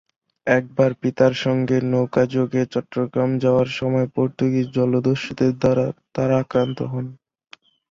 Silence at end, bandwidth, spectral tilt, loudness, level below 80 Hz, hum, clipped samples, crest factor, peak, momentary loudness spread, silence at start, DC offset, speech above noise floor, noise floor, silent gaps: 0.75 s; 7.4 kHz; -7.5 dB/octave; -21 LUFS; -54 dBFS; none; under 0.1%; 18 dB; -2 dBFS; 6 LU; 0.45 s; under 0.1%; 31 dB; -51 dBFS; none